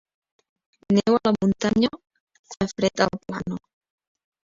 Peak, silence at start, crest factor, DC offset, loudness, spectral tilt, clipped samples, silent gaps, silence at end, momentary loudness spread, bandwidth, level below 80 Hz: -4 dBFS; 0.9 s; 22 dB; under 0.1%; -23 LUFS; -5.5 dB/octave; under 0.1%; 2.20-2.27 s, 2.39-2.44 s; 0.9 s; 11 LU; 7.6 kHz; -54 dBFS